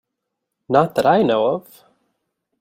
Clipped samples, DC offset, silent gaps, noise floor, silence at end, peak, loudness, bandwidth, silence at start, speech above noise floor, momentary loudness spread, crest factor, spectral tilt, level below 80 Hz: under 0.1%; under 0.1%; none; -79 dBFS; 1 s; -2 dBFS; -18 LUFS; 16 kHz; 0.7 s; 62 dB; 6 LU; 18 dB; -6.5 dB/octave; -62 dBFS